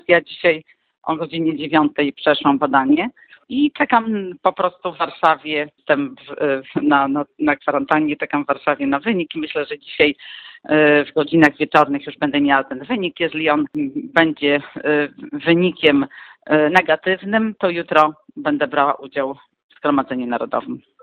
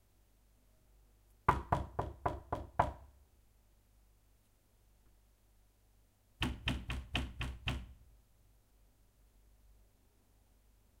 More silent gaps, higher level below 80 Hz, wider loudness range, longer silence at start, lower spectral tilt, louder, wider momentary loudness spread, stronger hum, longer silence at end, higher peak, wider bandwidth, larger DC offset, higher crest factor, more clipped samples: first, 0.98-1.02 s, 19.63-19.69 s vs none; second, -60 dBFS vs -50 dBFS; second, 3 LU vs 9 LU; second, 0.1 s vs 1.5 s; first, -7 dB/octave vs -5.5 dB/octave; first, -18 LUFS vs -39 LUFS; about the same, 10 LU vs 9 LU; second, none vs 50 Hz at -65 dBFS; second, 0.25 s vs 2.95 s; first, 0 dBFS vs -12 dBFS; second, 6.8 kHz vs 16 kHz; neither; second, 18 dB vs 32 dB; neither